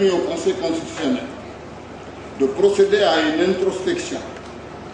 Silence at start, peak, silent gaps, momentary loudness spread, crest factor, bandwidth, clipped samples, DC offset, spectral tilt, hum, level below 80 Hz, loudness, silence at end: 0 s; -4 dBFS; none; 20 LU; 18 dB; 9.8 kHz; under 0.1%; under 0.1%; -4.5 dB/octave; none; -50 dBFS; -20 LUFS; 0 s